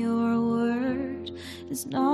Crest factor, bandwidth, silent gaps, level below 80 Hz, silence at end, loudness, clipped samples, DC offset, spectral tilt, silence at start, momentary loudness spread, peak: 12 dB; 14.5 kHz; none; -60 dBFS; 0 s; -28 LUFS; under 0.1%; under 0.1%; -5.5 dB/octave; 0 s; 12 LU; -14 dBFS